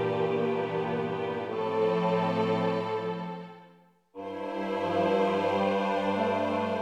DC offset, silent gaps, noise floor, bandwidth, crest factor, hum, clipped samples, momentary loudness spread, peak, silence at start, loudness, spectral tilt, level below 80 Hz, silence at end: under 0.1%; none; -59 dBFS; 10 kHz; 16 dB; none; under 0.1%; 10 LU; -14 dBFS; 0 s; -29 LUFS; -7 dB/octave; -70 dBFS; 0 s